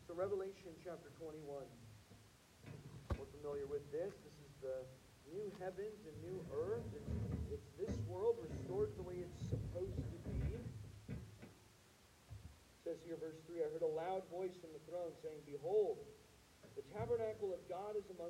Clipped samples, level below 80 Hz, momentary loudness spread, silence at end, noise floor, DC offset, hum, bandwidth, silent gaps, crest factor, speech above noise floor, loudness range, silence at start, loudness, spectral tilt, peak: under 0.1%; -60 dBFS; 19 LU; 0 s; -68 dBFS; under 0.1%; none; 16 kHz; none; 18 dB; 22 dB; 6 LU; 0 s; -46 LUFS; -7.5 dB/octave; -28 dBFS